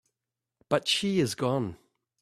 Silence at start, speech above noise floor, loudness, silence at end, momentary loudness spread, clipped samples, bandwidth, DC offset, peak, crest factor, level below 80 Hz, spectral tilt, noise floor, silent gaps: 0.7 s; 61 dB; -28 LUFS; 0.45 s; 6 LU; under 0.1%; 14.5 kHz; under 0.1%; -8 dBFS; 22 dB; -66 dBFS; -4.5 dB/octave; -88 dBFS; none